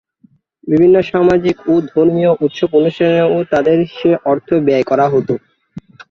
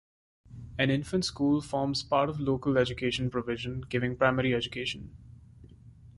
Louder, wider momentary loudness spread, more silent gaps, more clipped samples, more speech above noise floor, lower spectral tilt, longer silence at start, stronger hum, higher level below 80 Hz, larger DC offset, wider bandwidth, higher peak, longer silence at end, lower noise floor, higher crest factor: first, -13 LUFS vs -29 LUFS; second, 5 LU vs 8 LU; neither; neither; first, 40 dB vs 23 dB; first, -8 dB/octave vs -5.5 dB/octave; first, 0.65 s vs 0.5 s; neither; about the same, -50 dBFS vs -52 dBFS; neither; second, 6.8 kHz vs 11.5 kHz; first, 0 dBFS vs -10 dBFS; first, 0.3 s vs 0.1 s; about the same, -52 dBFS vs -52 dBFS; second, 12 dB vs 22 dB